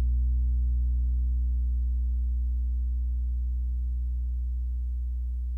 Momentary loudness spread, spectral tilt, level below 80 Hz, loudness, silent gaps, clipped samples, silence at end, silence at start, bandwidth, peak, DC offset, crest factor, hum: 5 LU; -10.5 dB/octave; -26 dBFS; -30 LUFS; none; under 0.1%; 0 s; 0 s; 0.5 kHz; -20 dBFS; under 0.1%; 6 dB; none